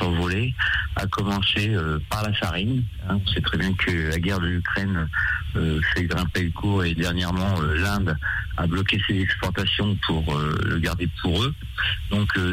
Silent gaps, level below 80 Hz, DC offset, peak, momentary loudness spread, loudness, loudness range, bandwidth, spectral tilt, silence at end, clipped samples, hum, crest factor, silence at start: none; -34 dBFS; under 0.1%; -10 dBFS; 4 LU; -23 LUFS; 1 LU; 16 kHz; -5.5 dB/octave; 0 s; under 0.1%; none; 12 dB; 0 s